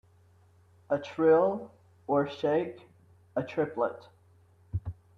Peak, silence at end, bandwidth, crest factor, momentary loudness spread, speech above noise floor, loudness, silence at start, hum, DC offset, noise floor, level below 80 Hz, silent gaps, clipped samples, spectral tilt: -14 dBFS; 0.25 s; 6.8 kHz; 18 dB; 16 LU; 33 dB; -30 LUFS; 0.9 s; none; under 0.1%; -61 dBFS; -58 dBFS; none; under 0.1%; -8 dB/octave